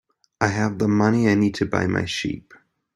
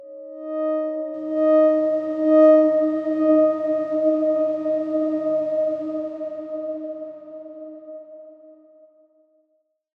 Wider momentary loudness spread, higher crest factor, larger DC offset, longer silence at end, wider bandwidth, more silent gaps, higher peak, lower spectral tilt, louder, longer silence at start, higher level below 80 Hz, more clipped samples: second, 8 LU vs 22 LU; about the same, 20 dB vs 16 dB; neither; second, 0.55 s vs 1.45 s; first, 12 kHz vs 4.6 kHz; neither; first, -2 dBFS vs -6 dBFS; second, -6 dB/octave vs -8 dB/octave; about the same, -21 LUFS vs -20 LUFS; first, 0.4 s vs 0 s; first, -54 dBFS vs -74 dBFS; neither